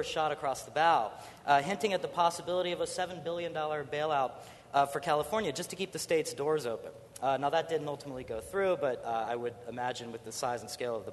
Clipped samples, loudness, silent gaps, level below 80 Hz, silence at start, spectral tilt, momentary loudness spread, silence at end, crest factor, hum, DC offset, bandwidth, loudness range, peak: under 0.1%; -33 LUFS; none; -66 dBFS; 0 s; -3.5 dB/octave; 11 LU; 0 s; 20 dB; none; under 0.1%; 12.5 kHz; 3 LU; -12 dBFS